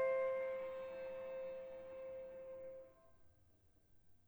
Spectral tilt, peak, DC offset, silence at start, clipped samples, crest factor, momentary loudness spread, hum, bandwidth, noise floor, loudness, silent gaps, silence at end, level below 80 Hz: -5.5 dB/octave; -30 dBFS; under 0.1%; 0 s; under 0.1%; 16 dB; 14 LU; none; over 20 kHz; -71 dBFS; -46 LUFS; none; 0.1 s; -76 dBFS